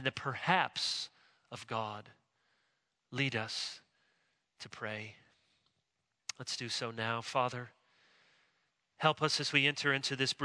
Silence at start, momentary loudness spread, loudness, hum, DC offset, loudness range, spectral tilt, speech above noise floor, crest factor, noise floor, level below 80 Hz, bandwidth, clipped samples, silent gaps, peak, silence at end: 0 s; 20 LU; -34 LUFS; none; under 0.1%; 9 LU; -3.5 dB/octave; 48 dB; 26 dB; -84 dBFS; -80 dBFS; 11 kHz; under 0.1%; none; -12 dBFS; 0 s